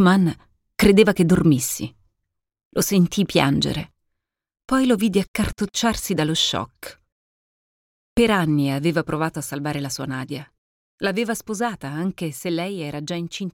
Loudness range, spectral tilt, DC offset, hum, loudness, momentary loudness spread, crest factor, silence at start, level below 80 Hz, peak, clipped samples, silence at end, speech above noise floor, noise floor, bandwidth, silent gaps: 7 LU; -5 dB/octave; under 0.1%; none; -21 LUFS; 13 LU; 20 dB; 0 s; -44 dBFS; -2 dBFS; under 0.1%; 0.05 s; 58 dB; -79 dBFS; 17 kHz; 2.65-2.71 s, 5.28-5.34 s, 7.12-8.16 s, 10.58-10.98 s